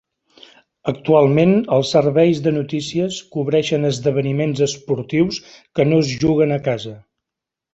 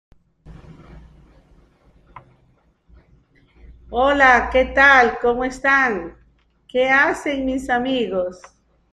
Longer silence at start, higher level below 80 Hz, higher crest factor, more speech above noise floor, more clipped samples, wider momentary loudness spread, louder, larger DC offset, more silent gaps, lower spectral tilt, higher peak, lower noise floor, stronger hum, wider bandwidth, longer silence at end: first, 0.85 s vs 0.45 s; second, -52 dBFS vs -42 dBFS; about the same, 16 dB vs 20 dB; first, 68 dB vs 42 dB; neither; second, 10 LU vs 14 LU; about the same, -18 LUFS vs -17 LUFS; neither; neither; first, -6.5 dB/octave vs -4 dB/octave; about the same, -2 dBFS vs -2 dBFS; first, -85 dBFS vs -59 dBFS; neither; second, 8.2 kHz vs 11.5 kHz; first, 0.75 s vs 0.55 s